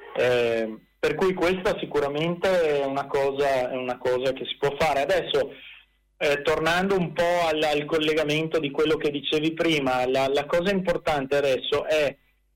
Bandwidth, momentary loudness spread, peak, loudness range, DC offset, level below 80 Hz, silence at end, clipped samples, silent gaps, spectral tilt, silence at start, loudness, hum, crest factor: 16.5 kHz; 5 LU; -10 dBFS; 2 LU; under 0.1%; -52 dBFS; 0.4 s; under 0.1%; none; -5 dB/octave; 0 s; -24 LUFS; none; 14 dB